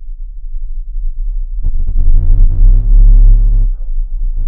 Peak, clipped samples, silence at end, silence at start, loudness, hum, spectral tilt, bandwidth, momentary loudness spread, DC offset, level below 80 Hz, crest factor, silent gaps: 0 dBFS; under 0.1%; 0 s; 0 s; -15 LUFS; none; -13 dB/octave; 0.7 kHz; 17 LU; under 0.1%; -8 dBFS; 8 dB; none